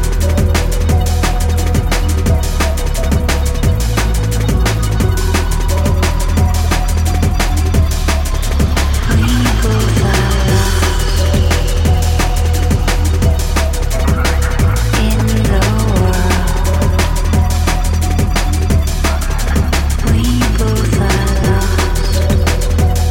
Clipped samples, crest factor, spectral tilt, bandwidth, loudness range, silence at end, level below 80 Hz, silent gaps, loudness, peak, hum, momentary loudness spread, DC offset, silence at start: under 0.1%; 12 dB; -5 dB/octave; 17 kHz; 1 LU; 0 s; -14 dBFS; none; -14 LUFS; 0 dBFS; none; 3 LU; under 0.1%; 0 s